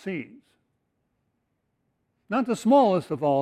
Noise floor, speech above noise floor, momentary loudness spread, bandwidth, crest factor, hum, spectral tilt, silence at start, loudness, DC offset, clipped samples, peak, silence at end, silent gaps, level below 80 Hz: -76 dBFS; 53 dB; 14 LU; 13 kHz; 18 dB; none; -6.5 dB/octave; 0.05 s; -23 LUFS; under 0.1%; under 0.1%; -8 dBFS; 0 s; none; -72 dBFS